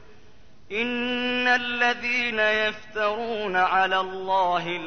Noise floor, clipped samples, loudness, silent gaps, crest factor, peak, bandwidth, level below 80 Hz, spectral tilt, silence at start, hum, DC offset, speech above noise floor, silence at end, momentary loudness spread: -55 dBFS; under 0.1%; -23 LUFS; none; 16 dB; -10 dBFS; 6.6 kHz; -58 dBFS; -3.5 dB/octave; 0.7 s; none; 0.6%; 31 dB; 0 s; 6 LU